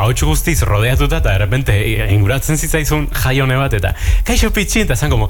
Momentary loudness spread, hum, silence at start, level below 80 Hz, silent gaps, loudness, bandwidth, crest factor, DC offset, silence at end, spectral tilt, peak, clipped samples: 2 LU; none; 0 s; -18 dBFS; none; -15 LUFS; 18 kHz; 12 dB; under 0.1%; 0 s; -5 dB/octave; 0 dBFS; under 0.1%